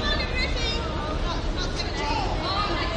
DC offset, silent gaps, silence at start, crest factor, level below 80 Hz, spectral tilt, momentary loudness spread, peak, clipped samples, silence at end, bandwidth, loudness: under 0.1%; none; 0 s; 14 dB; -30 dBFS; -4.5 dB/octave; 4 LU; -12 dBFS; under 0.1%; 0 s; 9.6 kHz; -27 LUFS